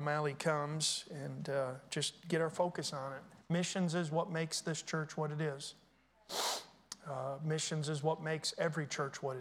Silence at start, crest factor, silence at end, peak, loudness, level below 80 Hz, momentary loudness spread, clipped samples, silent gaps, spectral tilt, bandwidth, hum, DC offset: 0 s; 18 dB; 0 s; -20 dBFS; -38 LUFS; -80 dBFS; 9 LU; under 0.1%; none; -4 dB/octave; 17 kHz; none; under 0.1%